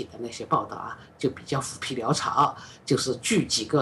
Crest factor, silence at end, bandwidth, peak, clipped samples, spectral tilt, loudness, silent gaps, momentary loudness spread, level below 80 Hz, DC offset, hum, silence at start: 18 dB; 0 s; 13 kHz; -8 dBFS; under 0.1%; -4 dB/octave; -26 LUFS; none; 12 LU; -60 dBFS; under 0.1%; none; 0 s